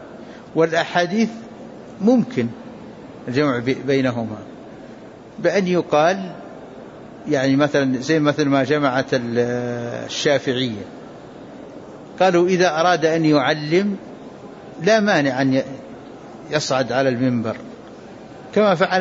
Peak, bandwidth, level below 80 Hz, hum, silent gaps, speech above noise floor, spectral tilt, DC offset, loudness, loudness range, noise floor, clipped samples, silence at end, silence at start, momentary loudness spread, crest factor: -4 dBFS; 7.8 kHz; -60 dBFS; none; none; 21 dB; -5.5 dB/octave; under 0.1%; -19 LUFS; 4 LU; -39 dBFS; under 0.1%; 0 s; 0 s; 22 LU; 16 dB